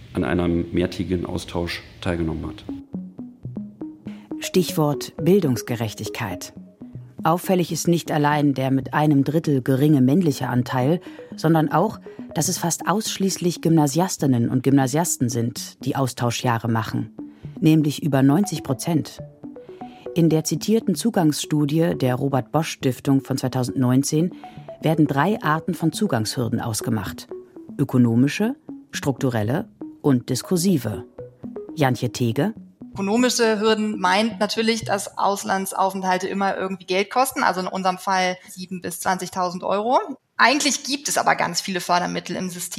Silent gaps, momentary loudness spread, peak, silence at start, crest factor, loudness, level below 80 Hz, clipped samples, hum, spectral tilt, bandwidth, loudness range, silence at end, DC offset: none; 16 LU; -2 dBFS; 0 s; 20 dB; -21 LUFS; -52 dBFS; under 0.1%; none; -5 dB/octave; 16.5 kHz; 4 LU; 0 s; under 0.1%